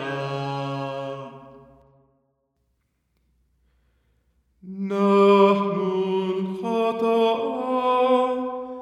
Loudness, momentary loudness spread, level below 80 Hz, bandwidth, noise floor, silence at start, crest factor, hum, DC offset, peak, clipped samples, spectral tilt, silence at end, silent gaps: -22 LUFS; 15 LU; -68 dBFS; 11 kHz; -71 dBFS; 0 s; 18 dB; none; under 0.1%; -6 dBFS; under 0.1%; -7.5 dB/octave; 0 s; none